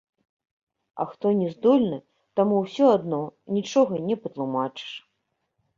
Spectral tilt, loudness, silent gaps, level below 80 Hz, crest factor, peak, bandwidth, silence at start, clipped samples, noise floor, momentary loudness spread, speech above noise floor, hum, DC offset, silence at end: -7 dB/octave; -24 LUFS; none; -68 dBFS; 20 dB; -6 dBFS; 7.4 kHz; 0.95 s; under 0.1%; -77 dBFS; 15 LU; 54 dB; none; under 0.1%; 0.8 s